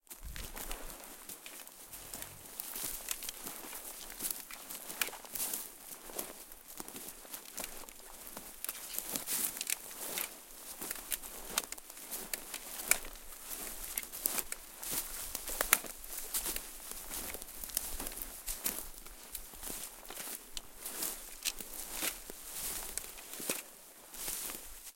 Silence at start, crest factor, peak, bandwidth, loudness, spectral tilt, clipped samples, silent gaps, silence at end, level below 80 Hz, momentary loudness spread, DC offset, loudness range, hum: 0.1 s; 40 dB; -2 dBFS; 17 kHz; -39 LUFS; 0 dB/octave; under 0.1%; none; 0 s; -56 dBFS; 12 LU; under 0.1%; 6 LU; none